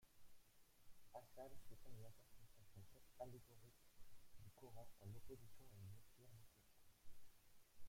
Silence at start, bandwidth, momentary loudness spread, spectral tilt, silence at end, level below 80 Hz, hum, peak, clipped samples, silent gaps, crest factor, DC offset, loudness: 0 s; 16.5 kHz; 9 LU; -5.5 dB/octave; 0 s; -74 dBFS; none; -42 dBFS; under 0.1%; none; 16 dB; under 0.1%; -64 LUFS